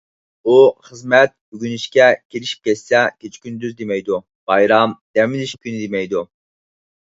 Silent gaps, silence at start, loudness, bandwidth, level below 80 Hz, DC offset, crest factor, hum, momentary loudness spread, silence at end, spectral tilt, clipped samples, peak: 1.41-1.52 s, 2.25-2.30 s, 4.35-4.47 s, 5.01-5.14 s; 0.45 s; -17 LUFS; 7.8 kHz; -62 dBFS; under 0.1%; 18 dB; none; 15 LU; 0.9 s; -5 dB/octave; under 0.1%; 0 dBFS